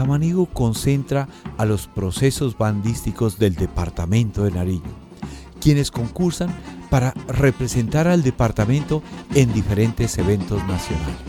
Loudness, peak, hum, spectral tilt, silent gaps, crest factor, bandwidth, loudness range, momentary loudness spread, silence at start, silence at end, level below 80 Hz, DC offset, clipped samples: -21 LUFS; -2 dBFS; none; -6.5 dB/octave; none; 18 dB; 17 kHz; 3 LU; 8 LU; 0 s; 0 s; -36 dBFS; under 0.1%; under 0.1%